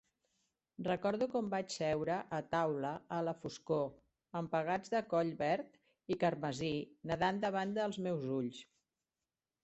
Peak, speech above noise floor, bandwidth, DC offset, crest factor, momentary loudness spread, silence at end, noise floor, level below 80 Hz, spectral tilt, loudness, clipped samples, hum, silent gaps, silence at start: -20 dBFS; over 53 dB; 8.2 kHz; under 0.1%; 18 dB; 8 LU; 1 s; under -90 dBFS; -72 dBFS; -6 dB/octave; -38 LUFS; under 0.1%; none; none; 0.8 s